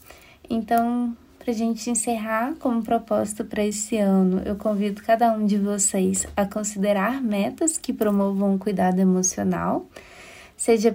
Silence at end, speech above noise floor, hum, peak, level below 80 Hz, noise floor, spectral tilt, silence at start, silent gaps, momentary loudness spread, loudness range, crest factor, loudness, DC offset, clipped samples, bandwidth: 0 s; 25 dB; none; -6 dBFS; -52 dBFS; -48 dBFS; -5 dB/octave; 0.1 s; none; 9 LU; 3 LU; 16 dB; -23 LUFS; under 0.1%; under 0.1%; 16 kHz